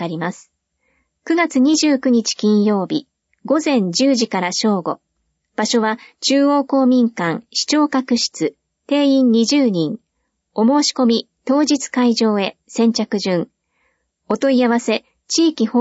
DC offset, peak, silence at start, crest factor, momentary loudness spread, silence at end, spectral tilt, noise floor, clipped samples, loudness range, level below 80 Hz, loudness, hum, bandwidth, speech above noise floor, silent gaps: under 0.1%; -4 dBFS; 0 s; 14 dB; 9 LU; 0 s; -4 dB/octave; -72 dBFS; under 0.1%; 2 LU; -68 dBFS; -17 LUFS; none; 8 kHz; 56 dB; none